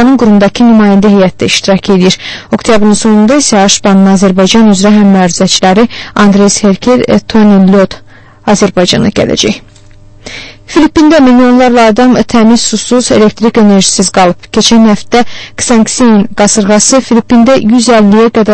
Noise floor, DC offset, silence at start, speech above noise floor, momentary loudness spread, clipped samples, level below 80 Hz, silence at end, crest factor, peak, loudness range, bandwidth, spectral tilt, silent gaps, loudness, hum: -34 dBFS; under 0.1%; 0 s; 28 dB; 6 LU; 3%; -32 dBFS; 0 s; 6 dB; 0 dBFS; 3 LU; 11 kHz; -4.5 dB/octave; none; -6 LUFS; none